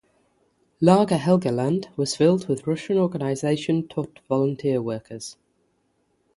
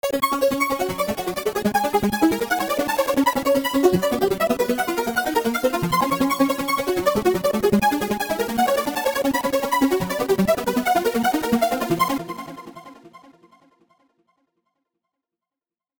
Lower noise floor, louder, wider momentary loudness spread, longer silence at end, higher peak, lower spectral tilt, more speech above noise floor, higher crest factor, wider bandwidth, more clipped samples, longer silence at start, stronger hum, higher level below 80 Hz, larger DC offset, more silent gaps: second, -69 dBFS vs under -90 dBFS; about the same, -23 LUFS vs -21 LUFS; first, 12 LU vs 4 LU; second, 1.05 s vs 2.8 s; about the same, -2 dBFS vs -4 dBFS; first, -6.5 dB/octave vs -4.5 dB/octave; second, 47 dB vs over 68 dB; about the same, 22 dB vs 18 dB; second, 11.5 kHz vs over 20 kHz; neither; first, 0.8 s vs 0.05 s; neither; second, -62 dBFS vs -50 dBFS; neither; neither